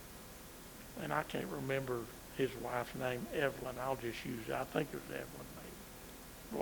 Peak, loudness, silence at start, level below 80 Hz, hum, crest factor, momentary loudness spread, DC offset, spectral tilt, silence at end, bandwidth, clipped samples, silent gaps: -18 dBFS; -41 LUFS; 0 s; -60 dBFS; none; 24 dB; 14 LU; under 0.1%; -5 dB/octave; 0 s; over 20 kHz; under 0.1%; none